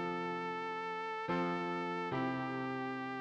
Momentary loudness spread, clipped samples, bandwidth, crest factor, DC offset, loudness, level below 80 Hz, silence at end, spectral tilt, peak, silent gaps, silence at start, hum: 4 LU; under 0.1%; 8.4 kHz; 16 dB; under 0.1%; -38 LUFS; -74 dBFS; 0 s; -6.5 dB/octave; -24 dBFS; none; 0 s; none